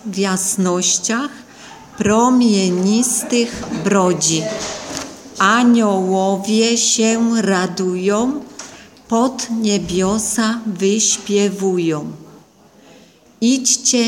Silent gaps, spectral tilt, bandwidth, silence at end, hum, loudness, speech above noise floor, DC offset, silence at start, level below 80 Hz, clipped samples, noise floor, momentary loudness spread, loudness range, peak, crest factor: none; -3.5 dB/octave; 17 kHz; 0 s; none; -16 LUFS; 31 dB; under 0.1%; 0.05 s; -50 dBFS; under 0.1%; -47 dBFS; 12 LU; 3 LU; 0 dBFS; 16 dB